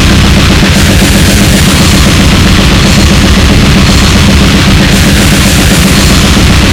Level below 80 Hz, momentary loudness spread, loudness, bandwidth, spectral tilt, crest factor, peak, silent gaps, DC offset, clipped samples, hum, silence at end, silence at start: -10 dBFS; 0 LU; -4 LUFS; over 20 kHz; -4.5 dB/octave; 4 dB; 0 dBFS; none; under 0.1%; 10%; none; 0 s; 0 s